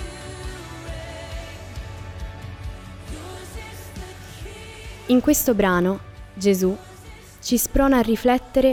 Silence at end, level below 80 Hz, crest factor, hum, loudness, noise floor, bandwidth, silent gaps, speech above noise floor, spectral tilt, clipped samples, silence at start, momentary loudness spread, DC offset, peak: 0 s; -38 dBFS; 18 dB; none; -20 LUFS; -42 dBFS; over 20 kHz; none; 24 dB; -5 dB/octave; under 0.1%; 0 s; 20 LU; under 0.1%; -6 dBFS